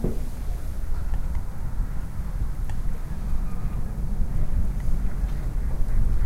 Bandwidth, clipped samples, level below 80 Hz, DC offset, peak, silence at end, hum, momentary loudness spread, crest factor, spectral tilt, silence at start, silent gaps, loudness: 12.5 kHz; under 0.1%; -24 dBFS; under 0.1%; -10 dBFS; 0 s; none; 5 LU; 14 dB; -7.5 dB/octave; 0 s; none; -32 LUFS